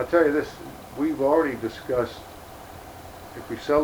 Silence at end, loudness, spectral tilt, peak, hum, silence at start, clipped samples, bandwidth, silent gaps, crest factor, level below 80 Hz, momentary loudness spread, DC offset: 0 s; -25 LUFS; -6 dB/octave; -6 dBFS; none; 0 s; under 0.1%; over 20 kHz; none; 18 dB; -52 dBFS; 20 LU; under 0.1%